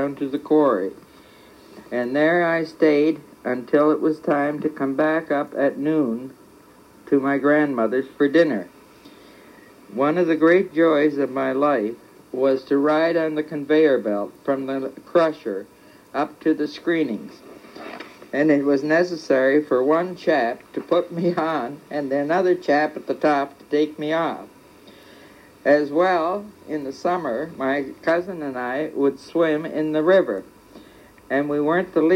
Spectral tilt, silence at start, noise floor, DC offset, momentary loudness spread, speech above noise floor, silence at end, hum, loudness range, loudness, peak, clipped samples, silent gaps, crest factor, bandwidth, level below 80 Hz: -7 dB/octave; 0 s; -49 dBFS; under 0.1%; 12 LU; 29 dB; 0 s; none; 4 LU; -21 LUFS; -4 dBFS; under 0.1%; none; 18 dB; 15 kHz; -66 dBFS